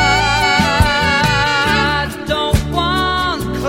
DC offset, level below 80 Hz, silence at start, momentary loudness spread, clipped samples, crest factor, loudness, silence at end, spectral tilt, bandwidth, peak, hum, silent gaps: 0.3%; -26 dBFS; 0 s; 6 LU; under 0.1%; 14 dB; -14 LUFS; 0 s; -4 dB/octave; 16.5 kHz; 0 dBFS; none; none